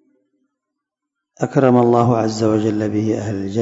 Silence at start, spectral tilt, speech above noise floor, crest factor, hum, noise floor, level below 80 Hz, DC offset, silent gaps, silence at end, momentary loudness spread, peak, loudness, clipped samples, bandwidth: 1.4 s; -7.5 dB/octave; 65 dB; 18 dB; none; -81 dBFS; -58 dBFS; under 0.1%; none; 0 s; 9 LU; 0 dBFS; -17 LUFS; under 0.1%; 8 kHz